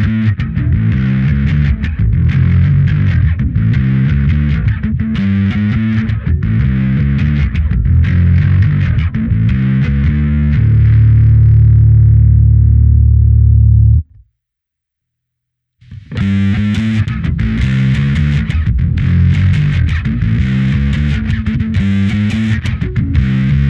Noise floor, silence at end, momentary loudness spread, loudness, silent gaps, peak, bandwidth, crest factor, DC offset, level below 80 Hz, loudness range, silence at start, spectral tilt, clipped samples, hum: -79 dBFS; 0 s; 7 LU; -12 LUFS; none; 0 dBFS; 5.8 kHz; 10 dB; under 0.1%; -18 dBFS; 6 LU; 0 s; -9 dB/octave; under 0.1%; none